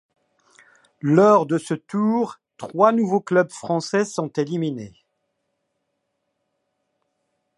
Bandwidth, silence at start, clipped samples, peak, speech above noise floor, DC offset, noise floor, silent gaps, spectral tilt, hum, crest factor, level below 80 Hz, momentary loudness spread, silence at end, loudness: 11.5 kHz; 1.05 s; under 0.1%; -2 dBFS; 56 dB; under 0.1%; -75 dBFS; none; -6.5 dB/octave; none; 20 dB; -70 dBFS; 13 LU; 2.7 s; -20 LUFS